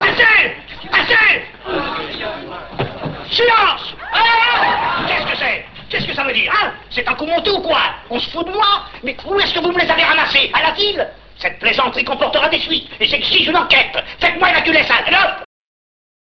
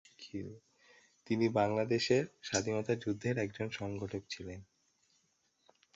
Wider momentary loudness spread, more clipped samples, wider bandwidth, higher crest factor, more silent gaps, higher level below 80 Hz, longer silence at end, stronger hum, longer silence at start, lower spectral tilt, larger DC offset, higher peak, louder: second, 12 LU vs 15 LU; neither; about the same, 8 kHz vs 8 kHz; second, 16 dB vs 22 dB; neither; first, -44 dBFS vs -66 dBFS; second, 0.85 s vs 1.3 s; neither; second, 0 s vs 0.2 s; about the same, -4.5 dB/octave vs -5 dB/octave; first, 0.4% vs under 0.1%; first, 0 dBFS vs -16 dBFS; first, -14 LUFS vs -35 LUFS